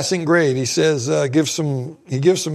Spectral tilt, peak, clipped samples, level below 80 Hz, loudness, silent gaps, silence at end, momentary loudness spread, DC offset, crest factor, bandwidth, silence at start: -5 dB/octave; -2 dBFS; under 0.1%; -62 dBFS; -18 LUFS; none; 0 s; 7 LU; under 0.1%; 16 dB; 14.5 kHz; 0 s